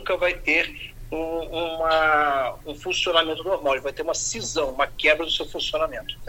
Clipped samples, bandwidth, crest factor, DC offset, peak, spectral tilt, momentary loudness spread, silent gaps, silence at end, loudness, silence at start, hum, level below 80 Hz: under 0.1%; 17 kHz; 20 dB; under 0.1%; -4 dBFS; -2 dB/octave; 10 LU; none; 0 s; -23 LUFS; 0 s; none; -44 dBFS